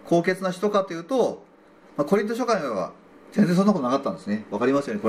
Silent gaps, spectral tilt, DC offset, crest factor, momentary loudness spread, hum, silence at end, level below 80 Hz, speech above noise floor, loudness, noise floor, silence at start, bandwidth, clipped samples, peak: none; -6.5 dB/octave; under 0.1%; 16 dB; 9 LU; none; 0 s; -68 dBFS; 29 dB; -24 LUFS; -51 dBFS; 0.05 s; 14.5 kHz; under 0.1%; -8 dBFS